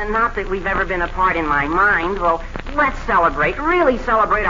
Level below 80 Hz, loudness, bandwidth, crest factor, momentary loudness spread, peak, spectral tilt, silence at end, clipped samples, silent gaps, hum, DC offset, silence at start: -30 dBFS; -17 LUFS; 7.6 kHz; 14 dB; 6 LU; -4 dBFS; -6 dB/octave; 0 s; under 0.1%; none; none; under 0.1%; 0 s